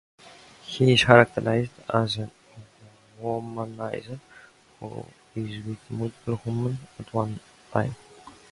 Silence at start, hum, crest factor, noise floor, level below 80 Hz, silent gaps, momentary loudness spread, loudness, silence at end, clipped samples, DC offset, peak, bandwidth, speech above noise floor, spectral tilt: 0.25 s; none; 26 dB; -54 dBFS; -56 dBFS; none; 22 LU; -25 LUFS; 0.2 s; under 0.1%; under 0.1%; 0 dBFS; 11.5 kHz; 29 dB; -6 dB/octave